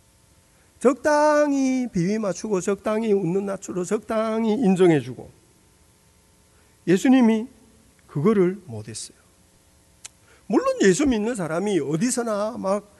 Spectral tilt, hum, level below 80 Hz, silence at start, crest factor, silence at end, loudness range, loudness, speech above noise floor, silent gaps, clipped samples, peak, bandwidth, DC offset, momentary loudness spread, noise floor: -6 dB/octave; none; -56 dBFS; 0.8 s; 18 dB; 0.2 s; 3 LU; -22 LUFS; 36 dB; none; under 0.1%; -6 dBFS; 12 kHz; under 0.1%; 15 LU; -57 dBFS